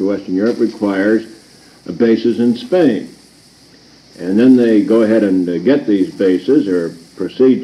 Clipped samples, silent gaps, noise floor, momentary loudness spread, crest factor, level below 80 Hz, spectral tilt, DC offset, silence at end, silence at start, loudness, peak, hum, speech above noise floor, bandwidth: under 0.1%; none; -45 dBFS; 12 LU; 14 dB; -60 dBFS; -7.5 dB/octave; under 0.1%; 0 s; 0 s; -14 LUFS; 0 dBFS; none; 32 dB; 11.5 kHz